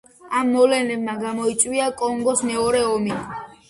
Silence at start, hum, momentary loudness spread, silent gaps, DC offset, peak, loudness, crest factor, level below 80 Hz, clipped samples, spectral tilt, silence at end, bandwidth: 0.25 s; none; 9 LU; none; under 0.1%; -2 dBFS; -21 LUFS; 18 dB; -54 dBFS; under 0.1%; -3 dB/octave; 0.15 s; 11.5 kHz